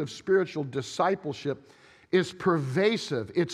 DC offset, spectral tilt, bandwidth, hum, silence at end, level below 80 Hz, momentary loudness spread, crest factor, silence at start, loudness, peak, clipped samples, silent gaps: under 0.1%; -6 dB/octave; 11.5 kHz; none; 0 s; -68 dBFS; 8 LU; 18 dB; 0 s; -28 LUFS; -10 dBFS; under 0.1%; none